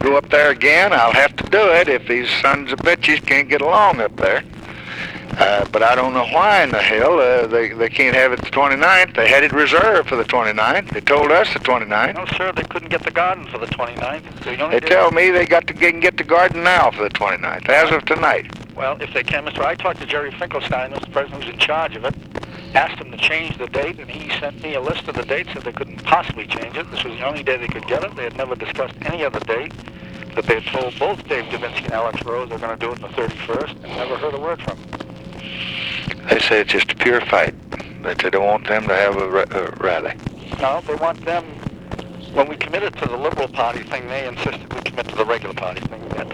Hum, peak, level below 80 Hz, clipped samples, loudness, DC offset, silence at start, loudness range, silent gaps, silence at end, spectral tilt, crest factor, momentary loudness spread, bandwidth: none; 0 dBFS; -44 dBFS; under 0.1%; -17 LUFS; 0.1%; 0 s; 10 LU; none; 0 s; -4.5 dB/octave; 18 dB; 15 LU; 14 kHz